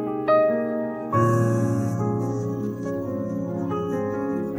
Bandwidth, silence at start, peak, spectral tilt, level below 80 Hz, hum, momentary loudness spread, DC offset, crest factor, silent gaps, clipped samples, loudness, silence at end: 16 kHz; 0 s; -8 dBFS; -8.5 dB/octave; -56 dBFS; none; 8 LU; under 0.1%; 14 dB; none; under 0.1%; -24 LUFS; 0 s